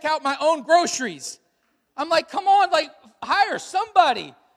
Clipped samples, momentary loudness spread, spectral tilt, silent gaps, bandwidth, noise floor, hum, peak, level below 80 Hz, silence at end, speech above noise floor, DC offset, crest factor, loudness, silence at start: under 0.1%; 16 LU; -1.5 dB/octave; none; 14 kHz; -69 dBFS; none; -2 dBFS; -70 dBFS; 0.25 s; 48 dB; under 0.1%; 20 dB; -21 LUFS; 0.05 s